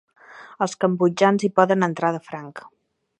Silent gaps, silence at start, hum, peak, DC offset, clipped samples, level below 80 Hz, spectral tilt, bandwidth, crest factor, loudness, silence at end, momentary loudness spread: none; 0.3 s; none; -2 dBFS; under 0.1%; under 0.1%; -74 dBFS; -6 dB/octave; 9.2 kHz; 20 dB; -21 LUFS; 0.5 s; 17 LU